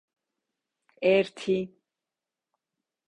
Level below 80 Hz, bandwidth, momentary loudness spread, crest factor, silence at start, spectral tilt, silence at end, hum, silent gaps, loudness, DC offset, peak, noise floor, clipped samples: -72 dBFS; 10.5 kHz; 8 LU; 22 dB; 1 s; -6 dB/octave; 1.4 s; none; none; -26 LUFS; under 0.1%; -10 dBFS; -89 dBFS; under 0.1%